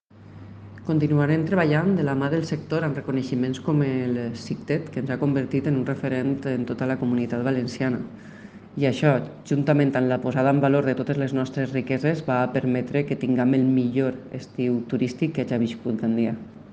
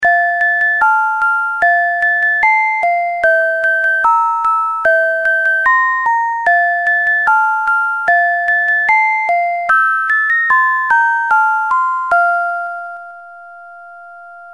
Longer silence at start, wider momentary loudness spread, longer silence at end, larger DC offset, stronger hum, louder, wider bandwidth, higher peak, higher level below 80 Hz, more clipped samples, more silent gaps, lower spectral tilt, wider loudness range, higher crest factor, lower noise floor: first, 0.2 s vs 0 s; first, 8 LU vs 4 LU; about the same, 0 s vs 0 s; second, under 0.1% vs 0.2%; neither; second, -24 LUFS vs -12 LUFS; second, 8.4 kHz vs 11.5 kHz; second, -6 dBFS vs -2 dBFS; about the same, -62 dBFS vs -60 dBFS; neither; neither; first, -8 dB/octave vs -2 dB/octave; about the same, 3 LU vs 2 LU; first, 18 dB vs 12 dB; first, -44 dBFS vs -35 dBFS